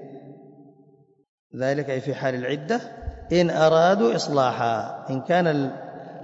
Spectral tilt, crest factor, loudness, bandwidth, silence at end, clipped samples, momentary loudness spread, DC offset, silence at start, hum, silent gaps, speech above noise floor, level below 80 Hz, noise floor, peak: -6 dB/octave; 18 dB; -23 LUFS; 8 kHz; 0 s; under 0.1%; 19 LU; under 0.1%; 0 s; none; 1.29-1.50 s; 35 dB; -50 dBFS; -57 dBFS; -6 dBFS